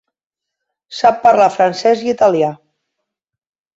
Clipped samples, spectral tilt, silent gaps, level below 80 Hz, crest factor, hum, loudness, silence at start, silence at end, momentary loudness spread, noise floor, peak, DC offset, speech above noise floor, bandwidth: under 0.1%; -5 dB/octave; none; -62 dBFS; 14 dB; none; -13 LUFS; 0.9 s; 1.2 s; 7 LU; -82 dBFS; -2 dBFS; under 0.1%; 70 dB; 8 kHz